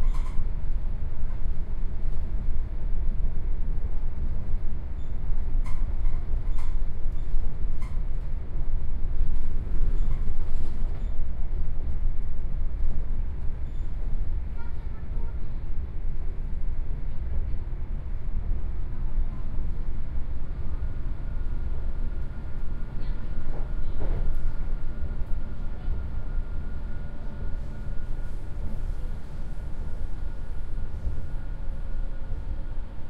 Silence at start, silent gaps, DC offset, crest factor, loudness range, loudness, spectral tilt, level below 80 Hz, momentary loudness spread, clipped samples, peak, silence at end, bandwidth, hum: 0 s; none; under 0.1%; 12 dB; 4 LU; -35 LUFS; -8.5 dB/octave; -26 dBFS; 5 LU; under 0.1%; -8 dBFS; 0 s; 2.3 kHz; none